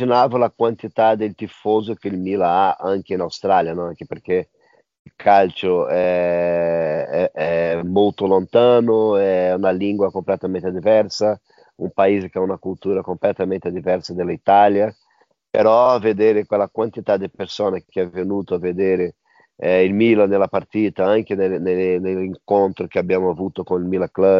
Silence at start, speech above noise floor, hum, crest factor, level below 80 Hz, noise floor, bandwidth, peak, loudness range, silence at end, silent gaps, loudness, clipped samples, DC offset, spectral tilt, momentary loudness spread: 0 s; 43 dB; none; 16 dB; -62 dBFS; -61 dBFS; 7.4 kHz; -2 dBFS; 3 LU; 0 s; 4.99-5.05 s; -19 LUFS; under 0.1%; under 0.1%; -5 dB/octave; 9 LU